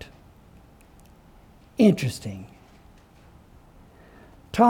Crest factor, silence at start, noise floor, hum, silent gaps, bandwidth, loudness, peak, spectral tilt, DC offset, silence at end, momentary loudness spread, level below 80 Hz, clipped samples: 22 dB; 1.8 s; -52 dBFS; none; none; 16.5 kHz; -24 LUFS; -6 dBFS; -7 dB/octave; under 0.1%; 0 s; 26 LU; -54 dBFS; under 0.1%